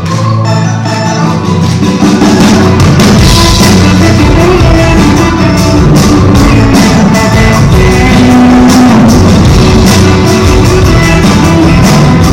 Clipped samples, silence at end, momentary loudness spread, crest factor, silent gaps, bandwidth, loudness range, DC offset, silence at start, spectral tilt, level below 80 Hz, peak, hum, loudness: 4%; 0 s; 5 LU; 4 dB; none; 17 kHz; 1 LU; under 0.1%; 0 s; -5.5 dB/octave; -14 dBFS; 0 dBFS; none; -4 LUFS